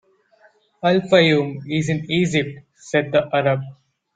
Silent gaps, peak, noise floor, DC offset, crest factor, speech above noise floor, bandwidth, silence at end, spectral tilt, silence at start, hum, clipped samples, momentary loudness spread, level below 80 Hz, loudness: none; -2 dBFS; -56 dBFS; under 0.1%; 18 dB; 37 dB; 9.2 kHz; 0.4 s; -6 dB/octave; 0.85 s; none; under 0.1%; 11 LU; -56 dBFS; -19 LUFS